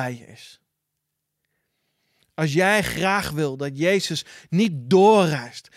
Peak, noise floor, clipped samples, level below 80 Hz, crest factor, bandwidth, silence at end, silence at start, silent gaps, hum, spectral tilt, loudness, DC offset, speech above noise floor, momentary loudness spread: -4 dBFS; -79 dBFS; under 0.1%; -54 dBFS; 18 dB; 15.5 kHz; 0.15 s; 0 s; none; none; -5 dB/octave; -21 LUFS; under 0.1%; 58 dB; 14 LU